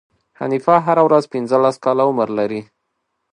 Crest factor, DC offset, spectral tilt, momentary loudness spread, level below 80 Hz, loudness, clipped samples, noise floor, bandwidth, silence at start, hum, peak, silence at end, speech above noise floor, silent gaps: 18 dB; under 0.1%; -7 dB/octave; 10 LU; -66 dBFS; -16 LUFS; under 0.1%; -73 dBFS; 10.5 kHz; 0.4 s; none; 0 dBFS; 0.7 s; 57 dB; none